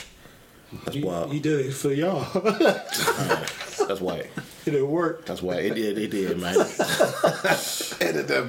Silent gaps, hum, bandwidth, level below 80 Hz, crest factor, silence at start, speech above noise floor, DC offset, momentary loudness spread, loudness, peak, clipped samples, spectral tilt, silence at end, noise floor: none; none; 17 kHz; -60 dBFS; 20 dB; 0 s; 25 dB; under 0.1%; 10 LU; -25 LUFS; -6 dBFS; under 0.1%; -4 dB/octave; 0 s; -50 dBFS